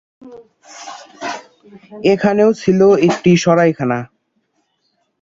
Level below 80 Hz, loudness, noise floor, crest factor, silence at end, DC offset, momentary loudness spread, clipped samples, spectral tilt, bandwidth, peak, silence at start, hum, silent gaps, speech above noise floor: -54 dBFS; -14 LUFS; -66 dBFS; 14 dB; 1.15 s; under 0.1%; 21 LU; under 0.1%; -6.5 dB/octave; 7.8 kHz; -2 dBFS; 0.25 s; none; none; 52 dB